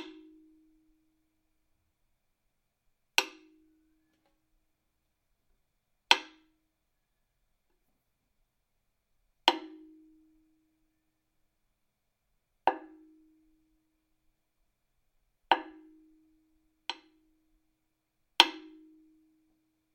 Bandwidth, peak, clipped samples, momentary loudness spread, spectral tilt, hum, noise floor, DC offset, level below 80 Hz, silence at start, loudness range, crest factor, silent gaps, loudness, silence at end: 16.5 kHz; 0 dBFS; under 0.1%; 24 LU; 0 dB/octave; none; -80 dBFS; under 0.1%; -78 dBFS; 0 s; 9 LU; 38 dB; none; -29 LUFS; 1.35 s